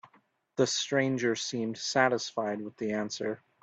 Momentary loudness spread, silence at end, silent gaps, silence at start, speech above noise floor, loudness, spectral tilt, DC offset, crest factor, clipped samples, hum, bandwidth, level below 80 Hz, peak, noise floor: 9 LU; 0.25 s; none; 0.05 s; 37 dB; -30 LUFS; -3.5 dB/octave; under 0.1%; 22 dB; under 0.1%; none; 9 kHz; -74 dBFS; -10 dBFS; -67 dBFS